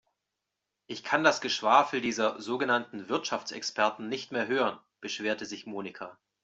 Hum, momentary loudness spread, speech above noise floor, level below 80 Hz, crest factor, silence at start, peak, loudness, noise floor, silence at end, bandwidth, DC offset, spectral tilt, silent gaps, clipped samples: none; 16 LU; 56 dB; -76 dBFS; 24 dB; 0.9 s; -6 dBFS; -29 LUFS; -86 dBFS; 0.3 s; 8.2 kHz; under 0.1%; -3 dB/octave; none; under 0.1%